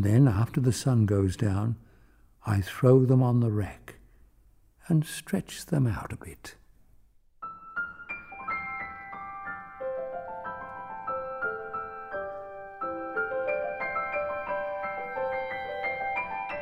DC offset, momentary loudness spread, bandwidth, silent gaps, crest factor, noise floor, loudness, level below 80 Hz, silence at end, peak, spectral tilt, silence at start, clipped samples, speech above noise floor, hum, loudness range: under 0.1%; 16 LU; 15.5 kHz; none; 20 dB; -60 dBFS; -29 LUFS; -56 dBFS; 0 s; -8 dBFS; -7 dB/octave; 0 s; under 0.1%; 35 dB; none; 11 LU